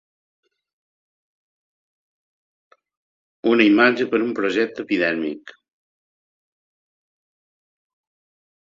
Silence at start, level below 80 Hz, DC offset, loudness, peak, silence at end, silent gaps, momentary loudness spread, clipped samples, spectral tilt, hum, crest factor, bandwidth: 3.45 s; -68 dBFS; under 0.1%; -19 LUFS; 0 dBFS; 3.25 s; none; 12 LU; under 0.1%; -5.5 dB/octave; none; 24 dB; 7.4 kHz